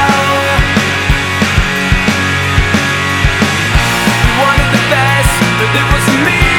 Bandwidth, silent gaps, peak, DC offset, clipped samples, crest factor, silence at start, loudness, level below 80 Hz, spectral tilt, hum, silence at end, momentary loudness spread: 18.5 kHz; none; 0 dBFS; under 0.1%; under 0.1%; 10 dB; 0 s; -10 LUFS; -20 dBFS; -4 dB/octave; none; 0 s; 2 LU